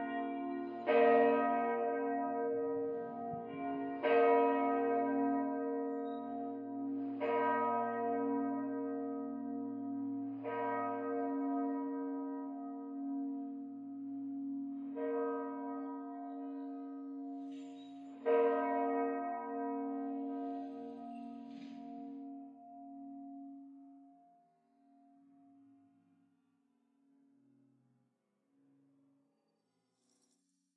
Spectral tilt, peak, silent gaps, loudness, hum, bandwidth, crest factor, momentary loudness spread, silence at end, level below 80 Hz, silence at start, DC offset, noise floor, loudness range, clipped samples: -8 dB/octave; -18 dBFS; none; -37 LUFS; none; 4.7 kHz; 20 dB; 17 LU; 6.65 s; under -90 dBFS; 0 s; under 0.1%; -82 dBFS; 16 LU; under 0.1%